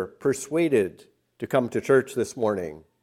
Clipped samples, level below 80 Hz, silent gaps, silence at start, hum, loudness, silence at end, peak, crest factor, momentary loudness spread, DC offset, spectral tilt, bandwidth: under 0.1%; -66 dBFS; none; 0 s; none; -25 LUFS; 0.25 s; -6 dBFS; 18 dB; 10 LU; under 0.1%; -5.5 dB/octave; 15 kHz